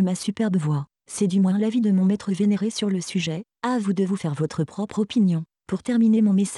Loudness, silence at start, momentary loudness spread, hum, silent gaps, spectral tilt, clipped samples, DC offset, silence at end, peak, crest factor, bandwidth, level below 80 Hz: -23 LUFS; 0 s; 9 LU; none; none; -6.5 dB/octave; under 0.1%; under 0.1%; 0 s; -12 dBFS; 10 dB; 12 kHz; -64 dBFS